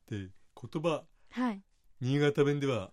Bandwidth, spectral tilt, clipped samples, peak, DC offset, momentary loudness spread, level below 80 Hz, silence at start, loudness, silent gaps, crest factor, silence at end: 11.5 kHz; -7 dB/octave; under 0.1%; -16 dBFS; under 0.1%; 17 LU; -70 dBFS; 0.1 s; -32 LUFS; none; 18 dB; 0.05 s